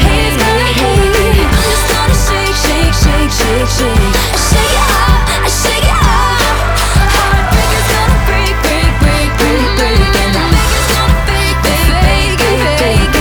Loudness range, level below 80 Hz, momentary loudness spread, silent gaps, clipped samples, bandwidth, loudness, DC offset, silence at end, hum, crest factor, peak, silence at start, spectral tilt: 1 LU; -14 dBFS; 2 LU; none; under 0.1%; over 20 kHz; -10 LUFS; under 0.1%; 0 s; none; 10 dB; 0 dBFS; 0 s; -4 dB/octave